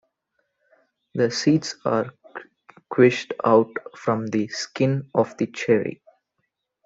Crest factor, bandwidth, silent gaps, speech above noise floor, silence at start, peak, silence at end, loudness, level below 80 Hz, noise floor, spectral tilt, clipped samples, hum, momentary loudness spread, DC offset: 20 dB; 7.8 kHz; none; 55 dB; 1.15 s; -2 dBFS; 0.9 s; -22 LUFS; -66 dBFS; -77 dBFS; -6 dB/octave; under 0.1%; none; 14 LU; under 0.1%